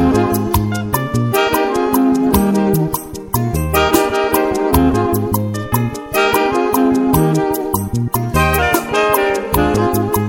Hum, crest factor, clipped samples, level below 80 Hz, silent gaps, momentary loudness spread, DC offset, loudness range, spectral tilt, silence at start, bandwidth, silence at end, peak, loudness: none; 14 dB; under 0.1%; -30 dBFS; none; 5 LU; under 0.1%; 1 LU; -5.5 dB/octave; 0 s; 17 kHz; 0 s; 0 dBFS; -15 LUFS